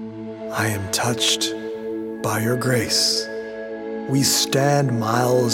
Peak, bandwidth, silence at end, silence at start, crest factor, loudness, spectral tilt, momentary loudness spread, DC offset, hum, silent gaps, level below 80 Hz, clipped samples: -4 dBFS; 17 kHz; 0 s; 0 s; 16 dB; -20 LUFS; -3.5 dB/octave; 13 LU; under 0.1%; none; none; -58 dBFS; under 0.1%